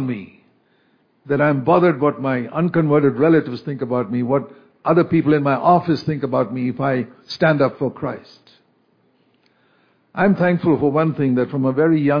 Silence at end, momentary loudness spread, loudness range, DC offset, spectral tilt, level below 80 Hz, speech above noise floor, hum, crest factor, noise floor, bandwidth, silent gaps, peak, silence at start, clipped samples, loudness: 0 s; 11 LU; 5 LU; under 0.1%; -9.5 dB/octave; -58 dBFS; 43 dB; none; 16 dB; -61 dBFS; 5.2 kHz; none; -2 dBFS; 0 s; under 0.1%; -18 LUFS